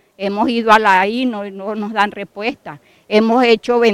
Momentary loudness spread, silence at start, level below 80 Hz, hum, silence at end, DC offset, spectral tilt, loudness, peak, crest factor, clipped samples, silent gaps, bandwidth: 13 LU; 0.2 s; -56 dBFS; none; 0 s; under 0.1%; -5 dB/octave; -15 LUFS; 0 dBFS; 16 dB; under 0.1%; none; 14 kHz